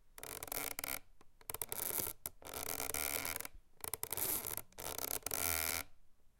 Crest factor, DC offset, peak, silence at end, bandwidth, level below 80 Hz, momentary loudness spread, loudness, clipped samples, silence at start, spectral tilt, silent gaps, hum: 28 dB; under 0.1%; -14 dBFS; 0.1 s; 17 kHz; -60 dBFS; 11 LU; -40 LUFS; under 0.1%; 0.05 s; -1 dB/octave; none; none